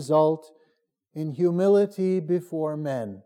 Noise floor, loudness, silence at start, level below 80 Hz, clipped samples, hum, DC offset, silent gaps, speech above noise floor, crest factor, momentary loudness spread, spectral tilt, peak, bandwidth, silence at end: -71 dBFS; -25 LUFS; 0 s; -86 dBFS; under 0.1%; none; under 0.1%; none; 48 dB; 14 dB; 13 LU; -8 dB/octave; -10 dBFS; 14 kHz; 0.05 s